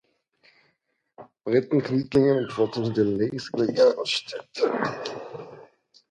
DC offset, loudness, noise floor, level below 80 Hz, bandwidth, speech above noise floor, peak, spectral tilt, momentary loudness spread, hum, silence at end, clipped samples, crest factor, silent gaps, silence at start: under 0.1%; -24 LUFS; -73 dBFS; -62 dBFS; 10 kHz; 50 dB; -8 dBFS; -6 dB/octave; 17 LU; none; 0.5 s; under 0.1%; 18 dB; none; 1.2 s